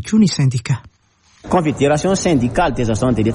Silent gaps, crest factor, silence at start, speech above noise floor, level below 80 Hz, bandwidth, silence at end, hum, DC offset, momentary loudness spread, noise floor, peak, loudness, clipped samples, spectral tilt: none; 12 dB; 0 s; 39 dB; -36 dBFS; 11.5 kHz; 0 s; none; under 0.1%; 6 LU; -55 dBFS; -4 dBFS; -16 LUFS; under 0.1%; -6 dB/octave